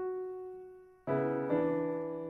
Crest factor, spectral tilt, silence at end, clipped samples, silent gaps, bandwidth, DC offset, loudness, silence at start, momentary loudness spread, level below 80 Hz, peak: 16 dB; -10.5 dB/octave; 0 s; under 0.1%; none; 4 kHz; under 0.1%; -34 LUFS; 0 s; 16 LU; -70 dBFS; -20 dBFS